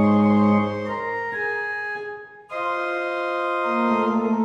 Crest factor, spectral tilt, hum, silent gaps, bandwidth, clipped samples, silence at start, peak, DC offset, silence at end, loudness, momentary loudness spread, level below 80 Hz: 16 dB; -8 dB/octave; none; none; 7.2 kHz; under 0.1%; 0 s; -6 dBFS; under 0.1%; 0 s; -23 LUFS; 12 LU; -64 dBFS